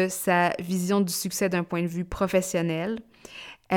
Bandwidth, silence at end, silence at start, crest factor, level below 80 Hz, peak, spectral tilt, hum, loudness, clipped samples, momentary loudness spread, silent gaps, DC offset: 19 kHz; 0 s; 0 s; 18 dB; -50 dBFS; -8 dBFS; -5 dB/octave; none; -26 LUFS; under 0.1%; 17 LU; none; under 0.1%